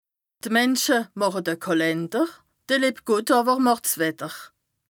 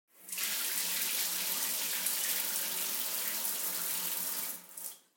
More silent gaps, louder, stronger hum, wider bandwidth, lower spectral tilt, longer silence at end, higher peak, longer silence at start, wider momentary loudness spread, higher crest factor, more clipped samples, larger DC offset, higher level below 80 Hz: neither; first, -22 LUFS vs -32 LUFS; neither; first, over 20 kHz vs 17 kHz; first, -3.5 dB/octave vs 1.5 dB/octave; first, 0.45 s vs 0.2 s; first, -6 dBFS vs -14 dBFS; first, 0.45 s vs 0.15 s; about the same, 8 LU vs 7 LU; about the same, 16 dB vs 20 dB; neither; neither; first, -76 dBFS vs under -90 dBFS